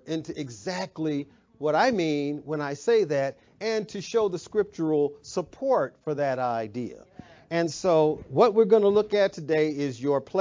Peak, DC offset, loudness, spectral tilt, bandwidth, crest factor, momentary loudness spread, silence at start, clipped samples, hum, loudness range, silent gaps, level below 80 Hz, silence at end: -8 dBFS; under 0.1%; -26 LUFS; -6 dB/octave; 7.6 kHz; 18 dB; 12 LU; 0.05 s; under 0.1%; none; 4 LU; none; -64 dBFS; 0 s